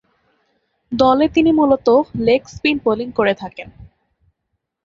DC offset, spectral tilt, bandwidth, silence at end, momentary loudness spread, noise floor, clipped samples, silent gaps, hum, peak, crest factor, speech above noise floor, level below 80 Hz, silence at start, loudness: under 0.1%; -6.5 dB/octave; 7.4 kHz; 1 s; 12 LU; -75 dBFS; under 0.1%; none; none; -2 dBFS; 16 dB; 59 dB; -48 dBFS; 0.9 s; -16 LUFS